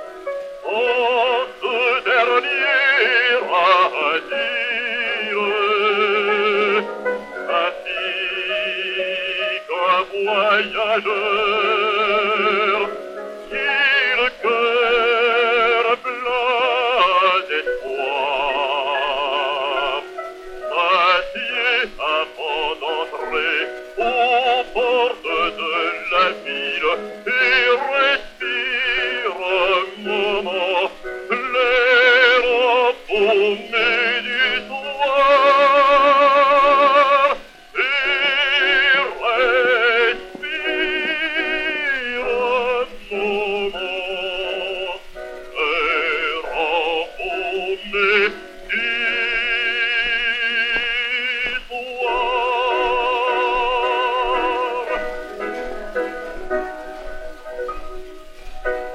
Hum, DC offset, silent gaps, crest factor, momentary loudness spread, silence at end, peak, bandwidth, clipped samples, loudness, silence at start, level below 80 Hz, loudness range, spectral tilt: none; under 0.1%; none; 18 dB; 12 LU; 0 s; 0 dBFS; 12 kHz; under 0.1%; -18 LUFS; 0 s; -44 dBFS; 6 LU; -3 dB/octave